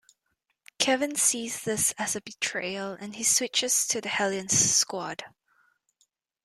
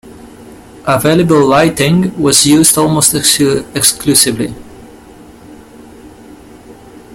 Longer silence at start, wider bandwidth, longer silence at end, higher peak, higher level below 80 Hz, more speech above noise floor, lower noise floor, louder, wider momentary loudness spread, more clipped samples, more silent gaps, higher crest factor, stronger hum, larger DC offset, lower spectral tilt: first, 0.8 s vs 0.05 s; second, 15 kHz vs over 20 kHz; first, 1.15 s vs 0 s; second, -6 dBFS vs 0 dBFS; second, -66 dBFS vs -42 dBFS; first, 50 dB vs 26 dB; first, -78 dBFS vs -36 dBFS; second, -25 LUFS vs -9 LUFS; first, 12 LU vs 6 LU; second, under 0.1% vs 0.2%; neither; first, 24 dB vs 12 dB; neither; neither; second, -1 dB/octave vs -3.5 dB/octave